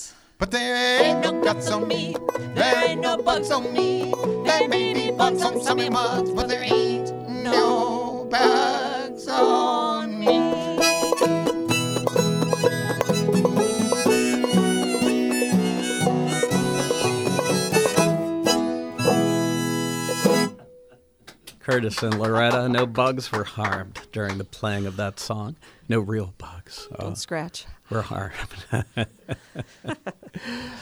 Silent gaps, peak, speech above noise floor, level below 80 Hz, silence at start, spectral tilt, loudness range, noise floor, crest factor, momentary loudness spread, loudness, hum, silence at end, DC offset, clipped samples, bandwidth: none; -4 dBFS; 30 dB; -52 dBFS; 0 s; -4.5 dB/octave; 9 LU; -53 dBFS; 18 dB; 13 LU; -22 LUFS; none; 0 s; under 0.1%; under 0.1%; over 20 kHz